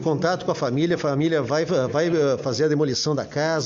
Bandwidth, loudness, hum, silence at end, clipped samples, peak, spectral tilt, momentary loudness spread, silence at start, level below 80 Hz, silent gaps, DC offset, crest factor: 7.6 kHz; -22 LUFS; none; 0 s; under 0.1%; -8 dBFS; -5.5 dB/octave; 3 LU; 0 s; -60 dBFS; none; under 0.1%; 14 dB